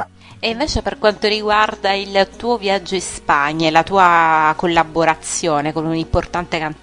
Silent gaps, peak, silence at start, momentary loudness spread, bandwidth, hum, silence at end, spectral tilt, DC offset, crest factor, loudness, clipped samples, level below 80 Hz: none; 0 dBFS; 0 s; 9 LU; 12 kHz; none; 0.1 s; -4 dB/octave; under 0.1%; 16 dB; -16 LUFS; under 0.1%; -36 dBFS